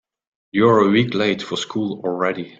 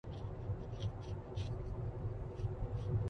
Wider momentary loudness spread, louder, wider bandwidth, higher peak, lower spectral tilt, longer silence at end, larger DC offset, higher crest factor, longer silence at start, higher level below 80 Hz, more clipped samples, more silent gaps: first, 10 LU vs 3 LU; first, -19 LUFS vs -43 LUFS; first, 7.8 kHz vs 6.6 kHz; first, -2 dBFS vs -26 dBFS; second, -6 dB/octave vs -8.5 dB/octave; about the same, 0.1 s vs 0 s; neither; about the same, 18 dB vs 14 dB; first, 0.55 s vs 0.05 s; second, -58 dBFS vs -48 dBFS; neither; neither